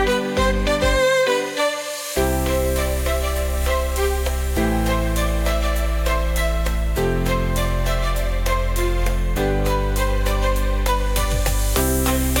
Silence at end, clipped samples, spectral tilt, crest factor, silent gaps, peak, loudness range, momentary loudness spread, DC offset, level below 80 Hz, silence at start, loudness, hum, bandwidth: 0 s; under 0.1%; -4.5 dB/octave; 16 dB; none; -4 dBFS; 2 LU; 4 LU; under 0.1%; -22 dBFS; 0 s; -21 LUFS; none; 17 kHz